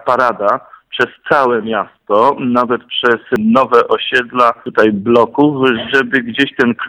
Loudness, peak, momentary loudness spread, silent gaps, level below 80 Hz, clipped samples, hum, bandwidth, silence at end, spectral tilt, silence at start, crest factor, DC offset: -13 LUFS; 0 dBFS; 6 LU; none; -54 dBFS; 0.3%; none; 11 kHz; 0 s; -6 dB/octave; 0.05 s; 14 dB; under 0.1%